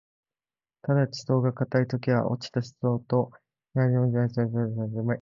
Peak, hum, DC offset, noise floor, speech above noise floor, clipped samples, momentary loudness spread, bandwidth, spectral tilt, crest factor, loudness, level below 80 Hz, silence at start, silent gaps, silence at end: -8 dBFS; none; under 0.1%; under -90 dBFS; over 64 dB; under 0.1%; 6 LU; 7.4 kHz; -8 dB/octave; 18 dB; -27 LUFS; -62 dBFS; 0.85 s; none; 0 s